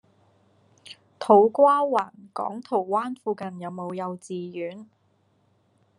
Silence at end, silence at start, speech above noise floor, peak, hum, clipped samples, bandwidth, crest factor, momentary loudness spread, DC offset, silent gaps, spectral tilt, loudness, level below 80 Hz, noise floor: 1.15 s; 0.9 s; 42 dB; -4 dBFS; none; under 0.1%; 11 kHz; 22 dB; 18 LU; under 0.1%; none; -6.5 dB/octave; -24 LUFS; -82 dBFS; -66 dBFS